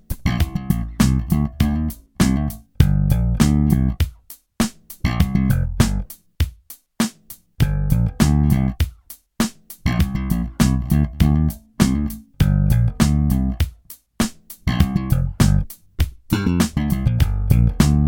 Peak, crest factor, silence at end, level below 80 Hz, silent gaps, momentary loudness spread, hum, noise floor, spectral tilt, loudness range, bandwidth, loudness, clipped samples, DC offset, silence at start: 0 dBFS; 18 dB; 0 s; -24 dBFS; none; 9 LU; none; -44 dBFS; -6 dB/octave; 3 LU; 17.5 kHz; -20 LUFS; under 0.1%; under 0.1%; 0.1 s